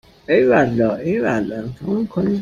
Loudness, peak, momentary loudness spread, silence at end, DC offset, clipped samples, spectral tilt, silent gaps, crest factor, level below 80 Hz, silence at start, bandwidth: -18 LUFS; -2 dBFS; 9 LU; 0 s; under 0.1%; under 0.1%; -8 dB/octave; none; 16 dB; -48 dBFS; 0.3 s; 7.4 kHz